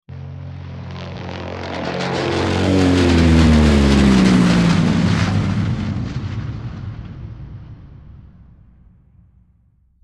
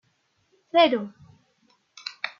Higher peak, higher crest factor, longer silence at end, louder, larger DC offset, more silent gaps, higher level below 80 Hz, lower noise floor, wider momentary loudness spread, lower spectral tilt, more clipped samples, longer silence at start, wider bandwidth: first, -2 dBFS vs -6 dBFS; second, 16 dB vs 22 dB; first, 1.8 s vs 0.1 s; first, -16 LUFS vs -22 LUFS; neither; neither; first, -28 dBFS vs -76 dBFS; second, -56 dBFS vs -70 dBFS; about the same, 20 LU vs 19 LU; first, -6.5 dB/octave vs -4.5 dB/octave; neither; second, 0.1 s vs 0.75 s; first, 11.5 kHz vs 7.2 kHz